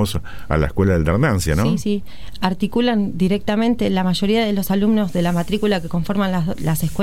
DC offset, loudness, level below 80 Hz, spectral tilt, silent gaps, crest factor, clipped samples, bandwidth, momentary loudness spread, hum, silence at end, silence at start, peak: 4%; -19 LUFS; -34 dBFS; -6.5 dB/octave; none; 16 dB; under 0.1%; 16.5 kHz; 6 LU; none; 0 s; 0 s; -2 dBFS